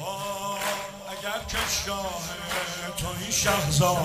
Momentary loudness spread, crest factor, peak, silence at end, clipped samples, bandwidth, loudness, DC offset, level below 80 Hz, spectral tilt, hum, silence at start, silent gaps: 10 LU; 18 dB; -10 dBFS; 0 s; under 0.1%; 16 kHz; -27 LUFS; under 0.1%; -44 dBFS; -3 dB/octave; none; 0 s; none